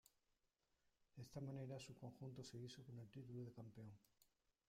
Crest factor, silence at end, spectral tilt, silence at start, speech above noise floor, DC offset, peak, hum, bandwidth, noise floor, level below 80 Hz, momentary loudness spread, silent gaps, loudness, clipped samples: 16 dB; 0.4 s; -6.5 dB/octave; 1 s; 32 dB; under 0.1%; -42 dBFS; none; 15.5 kHz; -88 dBFS; -82 dBFS; 9 LU; none; -57 LUFS; under 0.1%